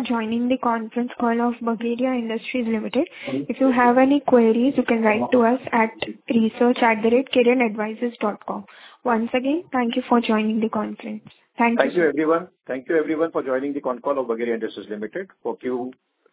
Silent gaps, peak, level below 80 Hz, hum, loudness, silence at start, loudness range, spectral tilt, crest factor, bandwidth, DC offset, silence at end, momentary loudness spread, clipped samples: none; -2 dBFS; -64 dBFS; none; -21 LUFS; 0 s; 5 LU; -9.5 dB/octave; 18 dB; 4 kHz; under 0.1%; 0.4 s; 13 LU; under 0.1%